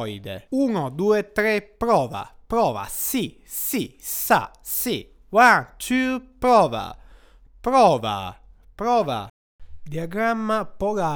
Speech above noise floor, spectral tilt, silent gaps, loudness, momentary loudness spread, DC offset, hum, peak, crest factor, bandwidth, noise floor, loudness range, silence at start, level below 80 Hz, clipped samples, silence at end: 28 dB; -4.5 dB/octave; 9.30-9.59 s; -22 LUFS; 14 LU; under 0.1%; none; -2 dBFS; 20 dB; over 20 kHz; -50 dBFS; 4 LU; 0 s; -48 dBFS; under 0.1%; 0 s